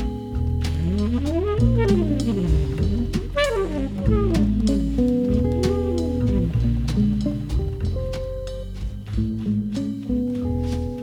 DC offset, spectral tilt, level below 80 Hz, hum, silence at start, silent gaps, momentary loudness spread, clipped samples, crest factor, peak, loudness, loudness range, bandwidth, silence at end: under 0.1%; -7.5 dB/octave; -28 dBFS; none; 0 s; none; 7 LU; under 0.1%; 16 dB; -6 dBFS; -23 LUFS; 5 LU; 13 kHz; 0 s